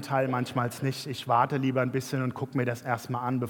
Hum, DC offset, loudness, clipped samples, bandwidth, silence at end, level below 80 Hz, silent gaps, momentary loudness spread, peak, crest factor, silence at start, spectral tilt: none; under 0.1%; -29 LUFS; under 0.1%; 18 kHz; 0 s; -72 dBFS; none; 6 LU; -10 dBFS; 18 dB; 0 s; -6.5 dB/octave